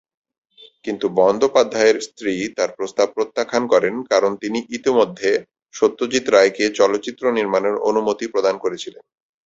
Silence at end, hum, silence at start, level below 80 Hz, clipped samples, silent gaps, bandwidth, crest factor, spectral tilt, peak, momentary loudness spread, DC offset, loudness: 0.55 s; none; 0.85 s; -62 dBFS; under 0.1%; 5.62-5.66 s; 8 kHz; 18 dB; -3.5 dB/octave; -2 dBFS; 9 LU; under 0.1%; -19 LUFS